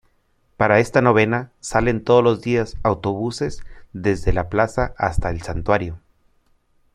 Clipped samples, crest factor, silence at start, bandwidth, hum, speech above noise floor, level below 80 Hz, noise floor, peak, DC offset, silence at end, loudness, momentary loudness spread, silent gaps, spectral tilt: under 0.1%; 20 dB; 0.6 s; 12.5 kHz; none; 43 dB; -34 dBFS; -62 dBFS; -2 dBFS; under 0.1%; 0.95 s; -20 LUFS; 11 LU; none; -6.5 dB/octave